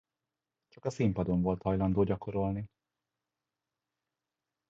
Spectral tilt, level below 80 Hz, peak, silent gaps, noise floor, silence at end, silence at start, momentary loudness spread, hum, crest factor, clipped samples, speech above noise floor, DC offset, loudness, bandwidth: -9 dB/octave; -52 dBFS; -16 dBFS; none; -90 dBFS; 2.05 s; 0.85 s; 11 LU; none; 18 dB; under 0.1%; 59 dB; under 0.1%; -32 LUFS; 7.6 kHz